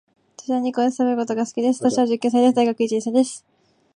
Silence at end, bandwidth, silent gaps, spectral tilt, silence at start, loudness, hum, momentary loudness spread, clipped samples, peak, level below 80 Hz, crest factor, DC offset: 0.55 s; 10.5 kHz; none; -4.5 dB/octave; 0.4 s; -20 LUFS; none; 8 LU; under 0.1%; -6 dBFS; -72 dBFS; 16 dB; under 0.1%